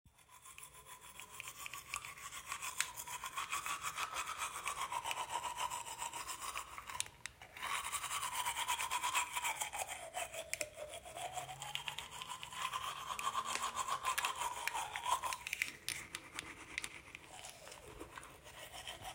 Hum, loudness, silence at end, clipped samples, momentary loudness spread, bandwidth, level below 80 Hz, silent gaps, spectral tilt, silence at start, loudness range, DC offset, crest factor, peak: none; -42 LUFS; 0 s; under 0.1%; 14 LU; 16 kHz; -70 dBFS; none; 0 dB/octave; 0.05 s; 5 LU; under 0.1%; 30 dB; -14 dBFS